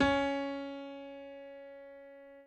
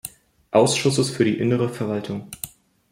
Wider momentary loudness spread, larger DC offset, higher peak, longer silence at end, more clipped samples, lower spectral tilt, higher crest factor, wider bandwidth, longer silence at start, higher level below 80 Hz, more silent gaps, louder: first, 20 LU vs 16 LU; neither; second, -16 dBFS vs -2 dBFS; second, 0 s vs 0.45 s; neither; about the same, -5.5 dB/octave vs -5 dB/octave; about the same, 20 dB vs 20 dB; second, 8.6 kHz vs 16.5 kHz; about the same, 0 s vs 0.05 s; about the same, -58 dBFS vs -60 dBFS; neither; second, -37 LUFS vs -21 LUFS